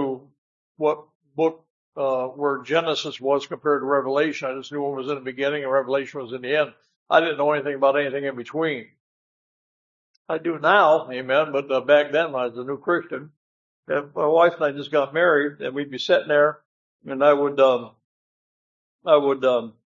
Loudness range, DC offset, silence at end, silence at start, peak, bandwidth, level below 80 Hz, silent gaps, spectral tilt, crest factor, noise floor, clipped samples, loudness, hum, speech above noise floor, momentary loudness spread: 4 LU; under 0.1%; 0.15 s; 0 s; -2 dBFS; 7.4 kHz; -78 dBFS; 0.38-0.75 s, 1.15-1.20 s, 1.70-1.93 s, 6.96-7.06 s, 9.00-10.25 s, 13.37-13.83 s, 16.65-16.99 s, 18.04-18.99 s; -5.5 dB/octave; 20 dB; under -90 dBFS; under 0.1%; -22 LUFS; none; over 68 dB; 11 LU